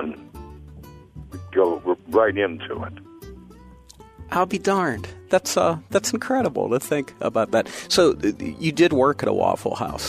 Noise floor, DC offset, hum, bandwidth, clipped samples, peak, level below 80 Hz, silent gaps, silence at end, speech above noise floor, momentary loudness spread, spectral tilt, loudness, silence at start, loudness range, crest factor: -47 dBFS; under 0.1%; none; 15.5 kHz; under 0.1%; -4 dBFS; -50 dBFS; none; 0 s; 25 dB; 23 LU; -4.5 dB/octave; -22 LUFS; 0 s; 4 LU; 18 dB